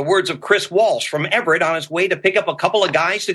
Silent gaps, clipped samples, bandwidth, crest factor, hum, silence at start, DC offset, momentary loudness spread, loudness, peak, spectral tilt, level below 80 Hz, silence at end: none; under 0.1%; 12.5 kHz; 16 dB; none; 0 s; under 0.1%; 3 LU; -17 LUFS; -2 dBFS; -3.5 dB/octave; -64 dBFS; 0 s